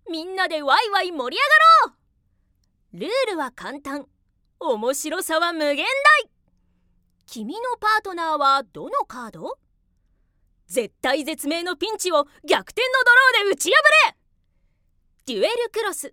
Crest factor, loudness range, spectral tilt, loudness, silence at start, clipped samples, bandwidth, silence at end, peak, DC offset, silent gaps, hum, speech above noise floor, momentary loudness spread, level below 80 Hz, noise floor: 20 dB; 9 LU; -1 dB/octave; -19 LUFS; 0.05 s; under 0.1%; 17.5 kHz; 0.05 s; -2 dBFS; under 0.1%; none; none; 45 dB; 20 LU; -64 dBFS; -66 dBFS